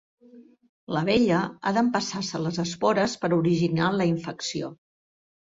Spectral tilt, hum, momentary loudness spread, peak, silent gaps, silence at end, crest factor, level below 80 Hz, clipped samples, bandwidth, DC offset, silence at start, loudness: -5.5 dB/octave; none; 9 LU; -8 dBFS; 0.69-0.87 s; 0.7 s; 18 dB; -60 dBFS; under 0.1%; 8 kHz; under 0.1%; 0.35 s; -25 LUFS